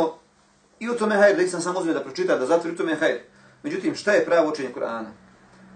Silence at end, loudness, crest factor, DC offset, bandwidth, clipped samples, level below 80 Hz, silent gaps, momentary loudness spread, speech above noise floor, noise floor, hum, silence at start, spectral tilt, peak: 0.65 s; -23 LUFS; 18 dB; under 0.1%; 9.6 kHz; under 0.1%; -70 dBFS; none; 14 LU; 37 dB; -59 dBFS; none; 0 s; -4.5 dB/octave; -6 dBFS